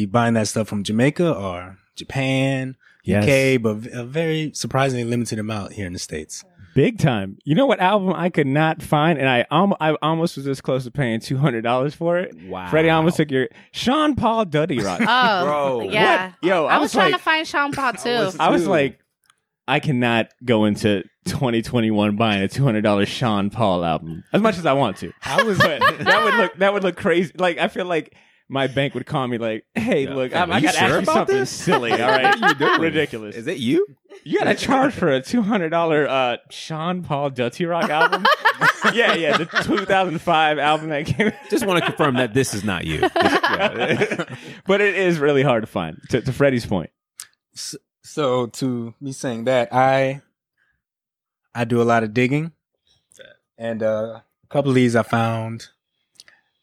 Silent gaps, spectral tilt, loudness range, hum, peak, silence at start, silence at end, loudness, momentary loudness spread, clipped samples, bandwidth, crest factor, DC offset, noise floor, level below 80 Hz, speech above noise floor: none; -5.5 dB/octave; 5 LU; none; -2 dBFS; 0 s; 0.95 s; -19 LUFS; 11 LU; under 0.1%; 16 kHz; 18 dB; under 0.1%; -88 dBFS; -52 dBFS; 68 dB